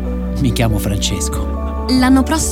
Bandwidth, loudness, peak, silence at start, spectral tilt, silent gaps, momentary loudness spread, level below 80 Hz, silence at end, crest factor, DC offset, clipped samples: 17.5 kHz; -16 LUFS; -2 dBFS; 0 s; -5 dB/octave; none; 9 LU; -22 dBFS; 0 s; 14 dB; under 0.1%; under 0.1%